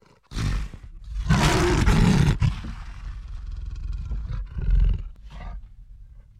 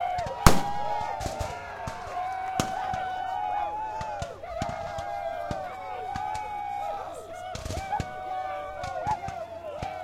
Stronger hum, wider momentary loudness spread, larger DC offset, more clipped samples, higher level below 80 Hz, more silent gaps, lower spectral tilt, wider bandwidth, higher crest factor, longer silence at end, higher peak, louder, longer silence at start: neither; first, 21 LU vs 7 LU; neither; neither; first, -28 dBFS vs -40 dBFS; neither; first, -6 dB/octave vs -4.5 dB/octave; second, 13.5 kHz vs 16.5 kHz; second, 16 dB vs 30 dB; first, 0.2 s vs 0 s; second, -8 dBFS vs 0 dBFS; first, -24 LUFS vs -31 LUFS; first, 0.3 s vs 0 s